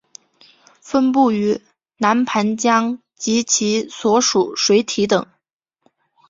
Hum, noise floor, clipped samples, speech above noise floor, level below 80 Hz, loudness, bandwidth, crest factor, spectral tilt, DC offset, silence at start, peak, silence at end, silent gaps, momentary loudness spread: none; -75 dBFS; under 0.1%; 58 dB; -62 dBFS; -17 LUFS; 7.8 kHz; 18 dB; -3.5 dB/octave; under 0.1%; 0.85 s; -2 dBFS; 1.05 s; none; 6 LU